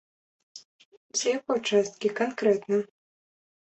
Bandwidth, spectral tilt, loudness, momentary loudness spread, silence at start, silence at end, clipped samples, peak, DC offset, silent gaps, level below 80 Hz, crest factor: 8.4 kHz; -3.5 dB/octave; -27 LUFS; 7 LU; 0.55 s; 0.75 s; under 0.1%; -10 dBFS; under 0.1%; 0.65-0.79 s, 0.85-1.09 s; -74 dBFS; 18 dB